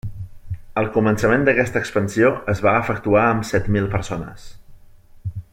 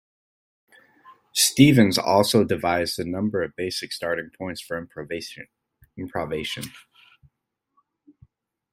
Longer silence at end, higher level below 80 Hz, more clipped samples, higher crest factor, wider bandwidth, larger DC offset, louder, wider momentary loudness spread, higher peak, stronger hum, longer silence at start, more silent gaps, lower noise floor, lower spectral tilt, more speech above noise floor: second, 0.1 s vs 1.95 s; first, -40 dBFS vs -58 dBFS; neither; second, 18 dB vs 24 dB; about the same, 16 kHz vs 16 kHz; neither; first, -19 LUFS vs -22 LUFS; about the same, 17 LU vs 18 LU; about the same, -2 dBFS vs -2 dBFS; neither; second, 0.05 s vs 1.1 s; neither; second, -45 dBFS vs -75 dBFS; first, -6.5 dB/octave vs -4.5 dB/octave; second, 26 dB vs 53 dB